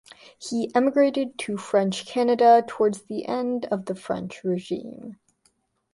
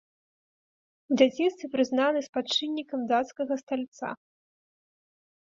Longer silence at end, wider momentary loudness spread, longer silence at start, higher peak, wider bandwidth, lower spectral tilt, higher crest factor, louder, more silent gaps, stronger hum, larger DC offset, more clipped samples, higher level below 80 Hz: second, 0.8 s vs 1.35 s; first, 15 LU vs 12 LU; second, 0.4 s vs 1.1 s; about the same, -6 dBFS vs -8 dBFS; first, 11.5 kHz vs 7.6 kHz; first, -5.5 dB/octave vs -3.5 dB/octave; about the same, 18 dB vs 22 dB; first, -24 LUFS vs -28 LUFS; second, none vs 2.29-2.33 s, 3.63-3.67 s, 3.88-3.92 s; neither; neither; neither; first, -68 dBFS vs -76 dBFS